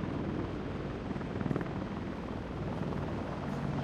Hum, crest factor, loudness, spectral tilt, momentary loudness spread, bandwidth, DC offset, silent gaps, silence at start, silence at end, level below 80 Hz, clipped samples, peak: none; 20 dB; -37 LUFS; -8 dB/octave; 4 LU; 10 kHz; under 0.1%; none; 0 s; 0 s; -50 dBFS; under 0.1%; -16 dBFS